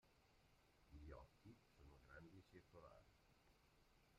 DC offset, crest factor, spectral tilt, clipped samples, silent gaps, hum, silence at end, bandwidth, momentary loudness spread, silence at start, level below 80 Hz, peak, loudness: under 0.1%; 18 dB; -6 dB/octave; under 0.1%; none; none; 0 s; 9.4 kHz; 7 LU; 0 s; -74 dBFS; -48 dBFS; -66 LUFS